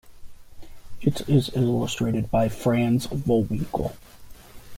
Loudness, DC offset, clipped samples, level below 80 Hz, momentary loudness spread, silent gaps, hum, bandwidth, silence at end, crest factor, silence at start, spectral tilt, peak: -24 LUFS; under 0.1%; under 0.1%; -44 dBFS; 6 LU; none; none; 16.5 kHz; 0 s; 16 dB; 0.05 s; -7 dB/octave; -8 dBFS